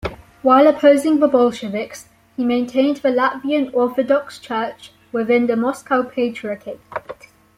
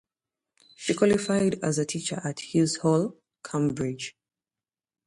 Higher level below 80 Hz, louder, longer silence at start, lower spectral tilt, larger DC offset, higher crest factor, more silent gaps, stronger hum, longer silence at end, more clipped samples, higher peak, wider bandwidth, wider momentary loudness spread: first, -52 dBFS vs -62 dBFS; first, -18 LUFS vs -27 LUFS; second, 0.05 s vs 0.8 s; about the same, -5.5 dB/octave vs -5 dB/octave; neither; about the same, 16 dB vs 20 dB; neither; neither; second, 0.45 s vs 0.95 s; neither; first, -2 dBFS vs -8 dBFS; first, 15 kHz vs 11.5 kHz; first, 18 LU vs 11 LU